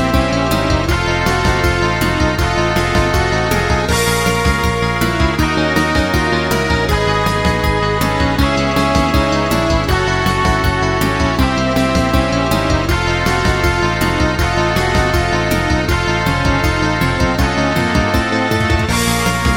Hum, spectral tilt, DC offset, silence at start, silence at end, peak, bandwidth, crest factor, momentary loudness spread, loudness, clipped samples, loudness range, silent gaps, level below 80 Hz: none; -5 dB/octave; 0.6%; 0 s; 0 s; 0 dBFS; 18 kHz; 14 dB; 1 LU; -15 LUFS; under 0.1%; 0 LU; none; -22 dBFS